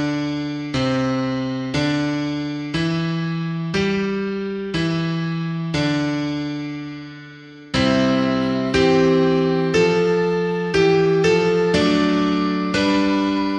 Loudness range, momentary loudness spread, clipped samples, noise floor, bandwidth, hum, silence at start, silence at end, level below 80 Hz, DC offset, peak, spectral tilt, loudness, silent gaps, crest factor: 6 LU; 9 LU; under 0.1%; -40 dBFS; 10 kHz; none; 0 s; 0 s; -46 dBFS; under 0.1%; -4 dBFS; -6 dB/octave; -20 LUFS; none; 14 dB